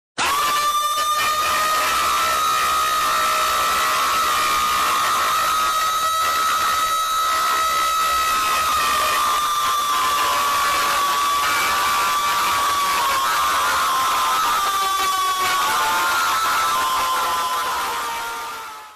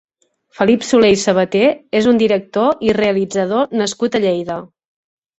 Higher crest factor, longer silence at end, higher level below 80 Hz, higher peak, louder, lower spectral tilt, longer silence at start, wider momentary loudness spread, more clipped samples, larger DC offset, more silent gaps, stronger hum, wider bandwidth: about the same, 10 dB vs 14 dB; second, 0 s vs 0.75 s; about the same, -50 dBFS vs -52 dBFS; second, -10 dBFS vs -2 dBFS; second, -18 LUFS vs -15 LUFS; second, 0.5 dB/octave vs -5 dB/octave; second, 0.15 s vs 0.6 s; second, 2 LU vs 6 LU; neither; neither; neither; neither; first, 15 kHz vs 8.2 kHz